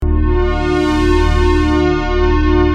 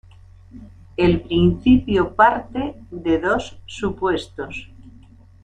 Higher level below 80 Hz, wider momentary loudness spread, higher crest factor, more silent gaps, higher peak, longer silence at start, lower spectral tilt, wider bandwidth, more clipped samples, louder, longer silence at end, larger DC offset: first, -16 dBFS vs -40 dBFS; second, 2 LU vs 16 LU; second, 12 dB vs 18 dB; neither; about the same, -2 dBFS vs -2 dBFS; second, 0 s vs 0.55 s; about the same, -7 dB/octave vs -7 dB/octave; about the same, 9.6 kHz vs 9.2 kHz; neither; first, -14 LUFS vs -19 LUFS; second, 0 s vs 0.55 s; neither